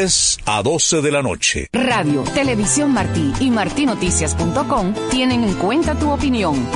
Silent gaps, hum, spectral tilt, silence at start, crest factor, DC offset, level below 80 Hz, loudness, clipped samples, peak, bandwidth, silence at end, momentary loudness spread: none; none; -3.5 dB/octave; 0 s; 14 dB; under 0.1%; -32 dBFS; -17 LUFS; under 0.1%; -4 dBFS; 11 kHz; 0 s; 4 LU